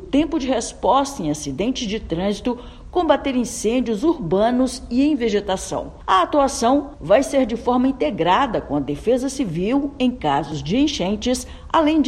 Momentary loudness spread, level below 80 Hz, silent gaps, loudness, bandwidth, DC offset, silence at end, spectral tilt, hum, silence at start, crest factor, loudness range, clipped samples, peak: 7 LU; -40 dBFS; none; -20 LUFS; 13 kHz; under 0.1%; 0 s; -5 dB/octave; none; 0 s; 18 dB; 3 LU; under 0.1%; -2 dBFS